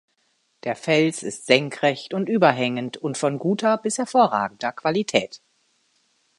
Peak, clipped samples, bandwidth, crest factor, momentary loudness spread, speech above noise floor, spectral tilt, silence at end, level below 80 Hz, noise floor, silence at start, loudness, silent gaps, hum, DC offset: 0 dBFS; under 0.1%; 11.5 kHz; 22 dB; 10 LU; 47 dB; -4.5 dB/octave; 1.05 s; -72 dBFS; -68 dBFS; 0.65 s; -22 LUFS; none; none; under 0.1%